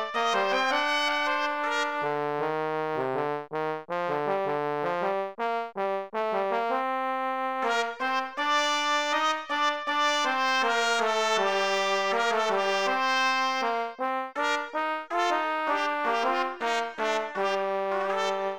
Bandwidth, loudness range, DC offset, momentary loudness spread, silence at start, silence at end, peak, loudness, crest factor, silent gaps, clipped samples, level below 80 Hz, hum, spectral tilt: over 20 kHz; 4 LU; 0.2%; 6 LU; 0 s; 0 s; -12 dBFS; -27 LUFS; 16 dB; none; under 0.1%; -74 dBFS; none; -2.5 dB/octave